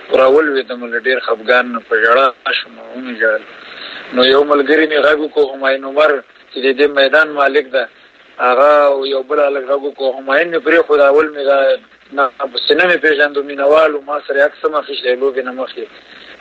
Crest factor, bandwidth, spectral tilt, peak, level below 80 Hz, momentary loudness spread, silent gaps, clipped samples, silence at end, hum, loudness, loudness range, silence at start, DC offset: 14 dB; 7.8 kHz; -4 dB/octave; 0 dBFS; -60 dBFS; 11 LU; none; under 0.1%; 0.05 s; none; -13 LUFS; 2 LU; 0 s; under 0.1%